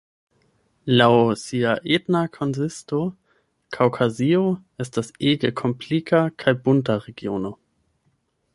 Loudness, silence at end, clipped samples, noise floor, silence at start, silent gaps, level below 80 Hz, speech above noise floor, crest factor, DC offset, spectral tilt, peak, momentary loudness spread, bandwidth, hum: -22 LUFS; 1 s; under 0.1%; -68 dBFS; 0.85 s; none; -60 dBFS; 47 dB; 20 dB; under 0.1%; -6.5 dB/octave; -2 dBFS; 11 LU; 11.5 kHz; none